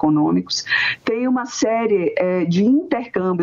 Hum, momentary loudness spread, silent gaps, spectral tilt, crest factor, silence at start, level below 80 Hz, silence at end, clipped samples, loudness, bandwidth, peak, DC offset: none; 5 LU; none; -5 dB/octave; 14 dB; 0 s; -58 dBFS; 0 s; under 0.1%; -19 LUFS; 7.6 kHz; -4 dBFS; under 0.1%